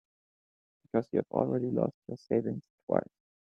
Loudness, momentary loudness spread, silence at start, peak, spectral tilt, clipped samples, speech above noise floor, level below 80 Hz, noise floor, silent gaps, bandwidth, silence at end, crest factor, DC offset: -32 LUFS; 10 LU; 0.95 s; -10 dBFS; -10.5 dB/octave; under 0.1%; over 59 dB; -72 dBFS; under -90 dBFS; 1.94-2.02 s, 2.70-2.87 s; 6.6 kHz; 0.5 s; 24 dB; under 0.1%